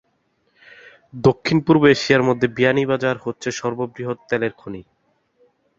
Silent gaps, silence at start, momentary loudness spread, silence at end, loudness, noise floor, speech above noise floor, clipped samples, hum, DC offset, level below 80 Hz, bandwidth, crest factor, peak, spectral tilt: none; 1.15 s; 15 LU; 0.95 s; -19 LUFS; -66 dBFS; 48 dB; under 0.1%; none; under 0.1%; -54 dBFS; 7.8 kHz; 20 dB; 0 dBFS; -6 dB/octave